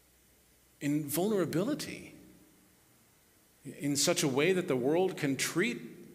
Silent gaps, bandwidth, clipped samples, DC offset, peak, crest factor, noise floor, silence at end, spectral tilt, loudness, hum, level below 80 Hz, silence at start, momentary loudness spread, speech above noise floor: none; 16 kHz; under 0.1%; under 0.1%; -14 dBFS; 20 dB; -65 dBFS; 0 s; -4 dB/octave; -31 LUFS; none; -72 dBFS; 0.8 s; 15 LU; 34 dB